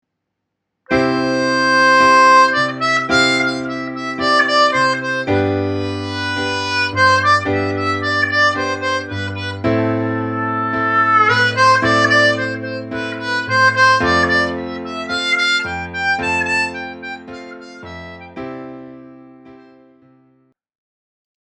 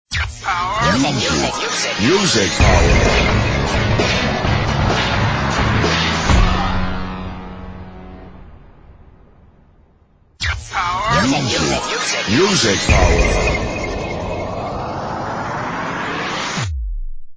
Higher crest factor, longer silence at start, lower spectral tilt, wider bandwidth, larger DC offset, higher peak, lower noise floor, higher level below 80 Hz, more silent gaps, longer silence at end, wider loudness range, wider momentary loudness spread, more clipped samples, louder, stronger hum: about the same, 16 dB vs 16 dB; first, 0.9 s vs 0.1 s; about the same, -4 dB/octave vs -4 dB/octave; first, 10.5 kHz vs 8 kHz; neither; about the same, 0 dBFS vs 0 dBFS; first, -76 dBFS vs -52 dBFS; second, -50 dBFS vs -24 dBFS; neither; first, 1.9 s vs 0 s; about the same, 10 LU vs 11 LU; first, 18 LU vs 11 LU; neither; about the same, -15 LUFS vs -17 LUFS; neither